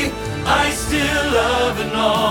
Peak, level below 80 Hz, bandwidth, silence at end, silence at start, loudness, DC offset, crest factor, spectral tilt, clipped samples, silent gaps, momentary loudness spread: -4 dBFS; -32 dBFS; 19 kHz; 0 s; 0 s; -18 LUFS; under 0.1%; 14 dB; -3.5 dB/octave; under 0.1%; none; 3 LU